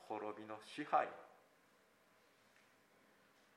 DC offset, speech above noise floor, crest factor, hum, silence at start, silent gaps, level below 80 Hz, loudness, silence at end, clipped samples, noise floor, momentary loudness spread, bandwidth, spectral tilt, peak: under 0.1%; 30 dB; 24 dB; none; 0 s; none; under -90 dBFS; -43 LUFS; 2.25 s; under 0.1%; -73 dBFS; 13 LU; 15.5 kHz; -4.5 dB/octave; -22 dBFS